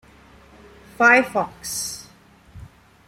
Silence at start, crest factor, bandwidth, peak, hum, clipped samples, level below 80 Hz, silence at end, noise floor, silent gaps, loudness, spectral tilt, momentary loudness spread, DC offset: 1 s; 22 dB; 16.5 kHz; -2 dBFS; none; under 0.1%; -54 dBFS; 0.4 s; -51 dBFS; none; -19 LUFS; -2.5 dB/octave; 15 LU; under 0.1%